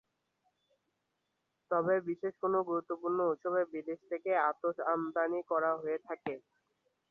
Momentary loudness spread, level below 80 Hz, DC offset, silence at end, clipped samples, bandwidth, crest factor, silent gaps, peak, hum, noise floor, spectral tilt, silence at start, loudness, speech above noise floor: 9 LU; -82 dBFS; under 0.1%; 0.7 s; under 0.1%; 4.1 kHz; 18 dB; none; -18 dBFS; none; -83 dBFS; -6 dB/octave; 1.7 s; -34 LUFS; 49 dB